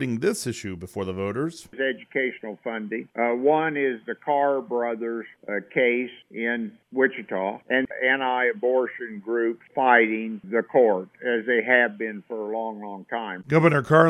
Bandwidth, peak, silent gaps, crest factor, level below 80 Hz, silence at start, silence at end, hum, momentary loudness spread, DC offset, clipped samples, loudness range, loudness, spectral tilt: 14 kHz; -4 dBFS; none; 22 dB; -68 dBFS; 0 s; 0 s; none; 13 LU; under 0.1%; under 0.1%; 4 LU; -24 LUFS; -6 dB/octave